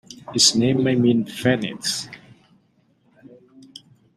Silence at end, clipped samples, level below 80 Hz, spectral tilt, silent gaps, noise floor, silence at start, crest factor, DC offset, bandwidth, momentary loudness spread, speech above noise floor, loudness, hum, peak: 2 s; under 0.1%; -62 dBFS; -3.5 dB/octave; none; -62 dBFS; 0.1 s; 22 dB; under 0.1%; 14 kHz; 13 LU; 43 dB; -19 LUFS; none; -2 dBFS